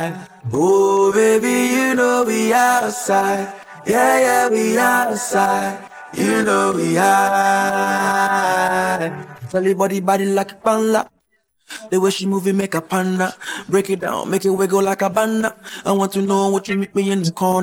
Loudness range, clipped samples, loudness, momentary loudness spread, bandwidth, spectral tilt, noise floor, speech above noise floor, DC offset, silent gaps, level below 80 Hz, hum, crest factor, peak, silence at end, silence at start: 4 LU; under 0.1%; -17 LUFS; 10 LU; 17.5 kHz; -4.5 dB/octave; -66 dBFS; 49 dB; under 0.1%; none; -62 dBFS; none; 16 dB; -2 dBFS; 0 s; 0 s